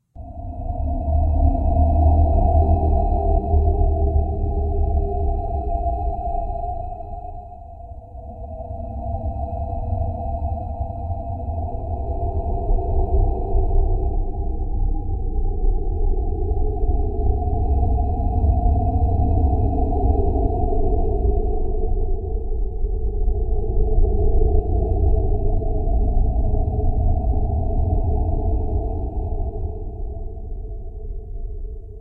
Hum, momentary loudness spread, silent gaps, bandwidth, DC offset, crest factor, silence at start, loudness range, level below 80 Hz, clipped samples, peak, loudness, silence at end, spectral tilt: none; 14 LU; none; 1.1 kHz; under 0.1%; 14 dB; 0.15 s; 9 LU; -20 dBFS; under 0.1%; -6 dBFS; -23 LUFS; 0 s; -14 dB/octave